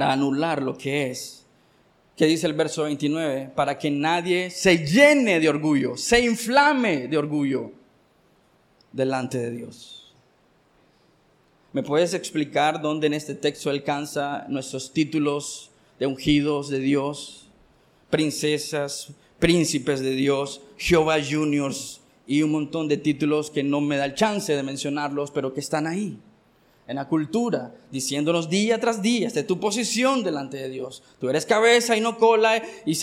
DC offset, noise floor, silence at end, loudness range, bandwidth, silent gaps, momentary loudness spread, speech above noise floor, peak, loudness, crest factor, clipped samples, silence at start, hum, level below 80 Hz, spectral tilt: under 0.1%; -61 dBFS; 0 s; 8 LU; 15.5 kHz; none; 13 LU; 38 dB; -2 dBFS; -23 LUFS; 22 dB; under 0.1%; 0 s; none; -52 dBFS; -4.5 dB/octave